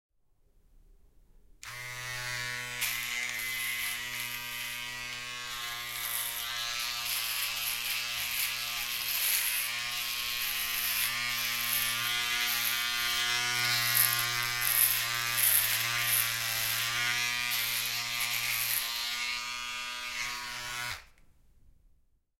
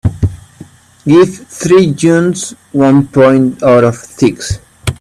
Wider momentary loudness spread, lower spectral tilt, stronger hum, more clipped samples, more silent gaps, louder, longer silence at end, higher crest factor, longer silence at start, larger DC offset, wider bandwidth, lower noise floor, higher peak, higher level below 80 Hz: about the same, 10 LU vs 12 LU; second, 1 dB/octave vs -6.5 dB/octave; neither; neither; neither; second, -29 LUFS vs -11 LUFS; first, 1.35 s vs 0.05 s; first, 26 dB vs 10 dB; first, 1.65 s vs 0.05 s; neither; first, 17 kHz vs 13.5 kHz; first, -67 dBFS vs -37 dBFS; second, -6 dBFS vs 0 dBFS; second, -60 dBFS vs -36 dBFS